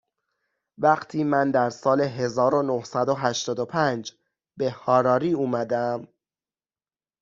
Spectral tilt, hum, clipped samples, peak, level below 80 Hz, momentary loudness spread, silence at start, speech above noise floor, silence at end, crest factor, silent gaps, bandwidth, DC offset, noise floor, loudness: -5.5 dB/octave; none; under 0.1%; -6 dBFS; -68 dBFS; 8 LU; 0.8 s; over 67 dB; 1.15 s; 20 dB; none; 7.6 kHz; under 0.1%; under -90 dBFS; -24 LUFS